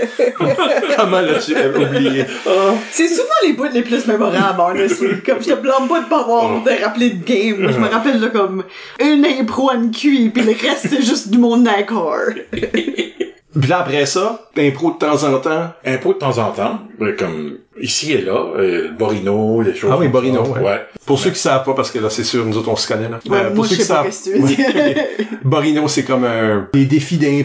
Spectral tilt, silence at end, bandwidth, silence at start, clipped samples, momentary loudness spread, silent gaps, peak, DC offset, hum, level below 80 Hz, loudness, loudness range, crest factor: -5 dB/octave; 0 s; 8 kHz; 0 s; under 0.1%; 6 LU; none; -2 dBFS; under 0.1%; none; -54 dBFS; -15 LUFS; 3 LU; 12 dB